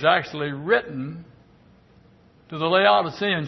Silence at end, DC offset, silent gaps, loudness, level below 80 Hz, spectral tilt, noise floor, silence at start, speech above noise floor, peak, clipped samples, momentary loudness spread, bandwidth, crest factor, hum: 0 s; under 0.1%; none; -22 LUFS; -62 dBFS; -6 dB/octave; -54 dBFS; 0 s; 33 dB; -4 dBFS; under 0.1%; 18 LU; 6.2 kHz; 20 dB; none